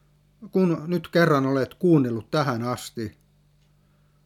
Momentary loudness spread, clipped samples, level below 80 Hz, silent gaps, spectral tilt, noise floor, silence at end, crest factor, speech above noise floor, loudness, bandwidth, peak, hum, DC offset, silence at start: 12 LU; under 0.1%; -64 dBFS; none; -7 dB/octave; -61 dBFS; 1.15 s; 18 dB; 38 dB; -23 LUFS; 16 kHz; -8 dBFS; 50 Hz at -45 dBFS; under 0.1%; 0.4 s